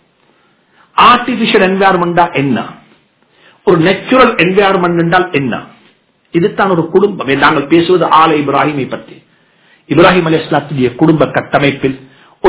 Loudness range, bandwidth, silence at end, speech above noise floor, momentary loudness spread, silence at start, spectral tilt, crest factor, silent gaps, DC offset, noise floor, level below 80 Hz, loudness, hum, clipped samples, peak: 1 LU; 4 kHz; 0 s; 42 dB; 11 LU; 0.95 s; -10 dB/octave; 12 dB; none; under 0.1%; -52 dBFS; -44 dBFS; -10 LUFS; none; 2%; 0 dBFS